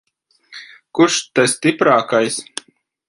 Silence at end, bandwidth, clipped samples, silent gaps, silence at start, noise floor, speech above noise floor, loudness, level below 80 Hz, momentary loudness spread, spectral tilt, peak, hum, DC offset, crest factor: 0.65 s; 11.5 kHz; under 0.1%; none; 0.5 s; -51 dBFS; 36 dB; -16 LUFS; -66 dBFS; 22 LU; -3.5 dB/octave; 0 dBFS; none; under 0.1%; 18 dB